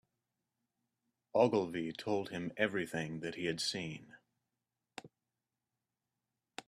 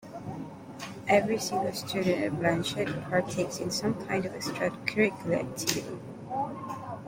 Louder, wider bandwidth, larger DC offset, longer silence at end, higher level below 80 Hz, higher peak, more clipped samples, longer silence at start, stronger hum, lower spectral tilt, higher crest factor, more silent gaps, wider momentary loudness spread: second, -36 LUFS vs -30 LUFS; second, 14 kHz vs 16.5 kHz; neither; about the same, 0.05 s vs 0 s; second, -76 dBFS vs -62 dBFS; second, -14 dBFS vs -8 dBFS; neither; first, 1.35 s vs 0 s; neither; about the same, -4.5 dB/octave vs -4.5 dB/octave; about the same, 24 dB vs 22 dB; neither; first, 22 LU vs 14 LU